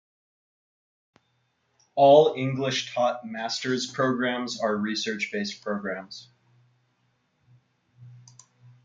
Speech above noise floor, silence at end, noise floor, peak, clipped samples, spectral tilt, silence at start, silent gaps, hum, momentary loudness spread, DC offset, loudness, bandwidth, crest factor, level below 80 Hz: 47 dB; 0.65 s; -72 dBFS; -4 dBFS; under 0.1%; -4.5 dB/octave; 1.95 s; none; none; 16 LU; under 0.1%; -25 LUFS; 7.8 kHz; 22 dB; -76 dBFS